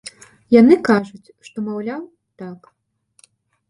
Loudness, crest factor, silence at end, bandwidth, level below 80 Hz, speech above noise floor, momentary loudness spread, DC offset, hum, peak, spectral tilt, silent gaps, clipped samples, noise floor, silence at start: -16 LUFS; 18 dB; 1.15 s; 11.5 kHz; -62 dBFS; 39 dB; 24 LU; under 0.1%; none; 0 dBFS; -6.5 dB/octave; none; under 0.1%; -56 dBFS; 0.5 s